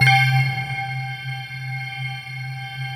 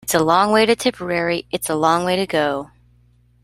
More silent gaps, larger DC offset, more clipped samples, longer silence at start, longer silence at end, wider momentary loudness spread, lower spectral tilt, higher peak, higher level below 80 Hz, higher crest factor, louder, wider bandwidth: neither; neither; neither; about the same, 0 s vs 0.05 s; second, 0 s vs 0.75 s; first, 14 LU vs 8 LU; about the same, -4.5 dB/octave vs -4 dB/octave; about the same, -4 dBFS vs -2 dBFS; second, -60 dBFS vs -52 dBFS; about the same, 18 dB vs 18 dB; second, -23 LUFS vs -18 LUFS; about the same, 16 kHz vs 16 kHz